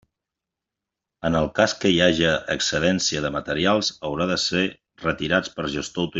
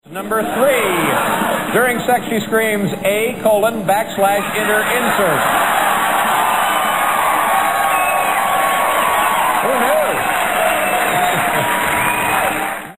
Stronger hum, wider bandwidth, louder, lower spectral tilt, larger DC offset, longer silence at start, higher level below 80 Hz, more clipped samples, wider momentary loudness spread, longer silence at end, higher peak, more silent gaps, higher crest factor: neither; second, 8.2 kHz vs 15.5 kHz; second, -22 LUFS vs -15 LUFS; about the same, -4 dB/octave vs -3 dB/octave; second, under 0.1% vs 0.7%; first, 1.25 s vs 0.05 s; about the same, -50 dBFS vs -48 dBFS; neither; first, 9 LU vs 3 LU; about the same, 0 s vs 0 s; about the same, -4 dBFS vs -2 dBFS; neither; first, 20 dB vs 14 dB